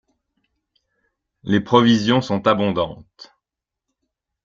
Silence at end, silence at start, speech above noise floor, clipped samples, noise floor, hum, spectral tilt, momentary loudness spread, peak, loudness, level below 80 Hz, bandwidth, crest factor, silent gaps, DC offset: 1.45 s; 1.45 s; 67 dB; under 0.1%; -85 dBFS; none; -6 dB/octave; 14 LU; -2 dBFS; -18 LUFS; -56 dBFS; 7.4 kHz; 20 dB; none; under 0.1%